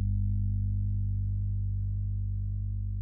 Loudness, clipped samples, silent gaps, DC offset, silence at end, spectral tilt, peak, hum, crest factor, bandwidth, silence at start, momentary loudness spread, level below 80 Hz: -32 LUFS; under 0.1%; none; under 0.1%; 0 s; -17.5 dB/octave; -22 dBFS; 50 Hz at -35 dBFS; 8 dB; 0.4 kHz; 0 s; 4 LU; -34 dBFS